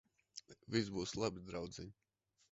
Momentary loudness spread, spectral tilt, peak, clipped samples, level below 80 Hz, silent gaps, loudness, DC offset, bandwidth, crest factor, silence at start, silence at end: 16 LU; -4.5 dB/octave; -22 dBFS; under 0.1%; -66 dBFS; none; -42 LUFS; under 0.1%; 8 kHz; 24 dB; 0.35 s; 0.6 s